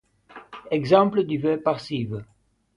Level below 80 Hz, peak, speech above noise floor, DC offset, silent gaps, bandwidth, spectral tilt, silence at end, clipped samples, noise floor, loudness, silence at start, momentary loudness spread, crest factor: -60 dBFS; -4 dBFS; 26 dB; under 0.1%; none; 11 kHz; -7.5 dB/octave; 0.5 s; under 0.1%; -48 dBFS; -23 LUFS; 0.35 s; 18 LU; 22 dB